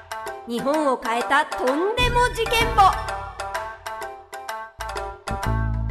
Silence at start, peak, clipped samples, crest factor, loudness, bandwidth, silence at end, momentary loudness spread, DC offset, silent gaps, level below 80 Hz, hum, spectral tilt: 0 s; -6 dBFS; under 0.1%; 16 dB; -23 LUFS; 13.5 kHz; 0 s; 15 LU; under 0.1%; none; -34 dBFS; none; -4.5 dB/octave